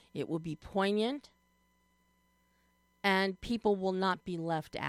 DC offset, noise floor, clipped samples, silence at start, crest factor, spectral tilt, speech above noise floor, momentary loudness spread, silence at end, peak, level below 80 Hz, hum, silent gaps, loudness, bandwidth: under 0.1%; -72 dBFS; under 0.1%; 0.15 s; 20 dB; -6 dB/octave; 39 dB; 8 LU; 0 s; -14 dBFS; -62 dBFS; none; none; -33 LUFS; 14 kHz